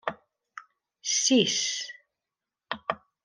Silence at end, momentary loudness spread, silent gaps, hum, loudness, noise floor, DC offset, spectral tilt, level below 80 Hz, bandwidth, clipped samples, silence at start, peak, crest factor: 0.25 s; 26 LU; none; none; -26 LUFS; -89 dBFS; under 0.1%; -1.5 dB/octave; -76 dBFS; 10.5 kHz; under 0.1%; 0.05 s; -8 dBFS; 22 dB